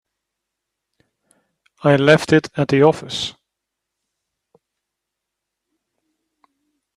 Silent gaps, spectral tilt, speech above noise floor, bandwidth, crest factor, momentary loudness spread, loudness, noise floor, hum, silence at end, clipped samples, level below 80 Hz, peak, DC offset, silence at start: none; -6 dB/octave; 66 dB; 12.5 kHz; 22 dB; 12 LU; -16 LUFS; -81 dBFS; none; 3.65 s; under 0.1%; -58 dBFS; 0 dBFS; under 0.1%; 1.85 s